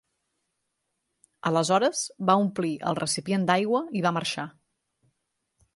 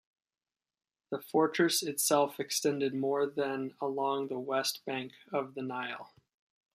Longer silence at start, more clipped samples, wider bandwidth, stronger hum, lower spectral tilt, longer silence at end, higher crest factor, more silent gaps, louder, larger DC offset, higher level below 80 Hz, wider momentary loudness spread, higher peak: first, 1.45 s vs 1.1 s; neither; second, 11.5 kHz vs 15.5 kHz; neither; first, -4.5 dB/octave vs -3 dB/octave; first, 1.25 s vs 0.7 s; about the same, 22 dB vs 20 dB; neither; first, -26 LUFS vs -32 LUFS; neither; first, -70 dBFS vs -84 dBFS; second, 8 LU vs 11 LU; first, -6 dBFS vs -12 dBFS